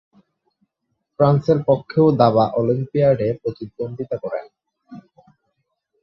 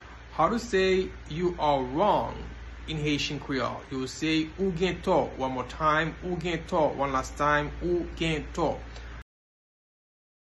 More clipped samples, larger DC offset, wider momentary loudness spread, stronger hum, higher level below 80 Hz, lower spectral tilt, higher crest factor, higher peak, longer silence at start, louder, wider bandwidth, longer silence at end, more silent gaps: neither; neither; first, 14 LU vs 11 LU; neither; second, -56 dBFS vs -44 dBFS; first, -10 dB/octave vs -5.5 dB/octave; about the same, 18 dB vs 18 dB; first, -2 dBFS vs -10 dBFS; first, 1.2 s vs 0 s; first, -19 LUFS vs -28 LUFS; second, 6 kHz vs 12 kHz; second, 1 s vs 1.3 s; neither